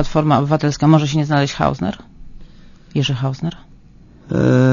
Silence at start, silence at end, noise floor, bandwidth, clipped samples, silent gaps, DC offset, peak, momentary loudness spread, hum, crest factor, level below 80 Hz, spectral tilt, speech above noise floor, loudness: 0 s; 0 s; -44 dBFS; 7.4 kHz; under 0.1%; none; under 0.1%; 0 dBFS; 12 LU; none; 18 dB; -38 dBFS; -7 dB/octave; 28 dB; -17 LUFS